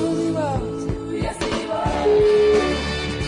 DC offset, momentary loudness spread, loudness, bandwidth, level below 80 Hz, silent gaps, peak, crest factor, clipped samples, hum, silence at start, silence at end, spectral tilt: under 0.1%; 11 LU; -20 LUFS; 11 kHz; -36 dBFS; none; -8 dBFS; 12 dB; under 0.1%; none; 0 s; 0 s; -5.5 dB/octave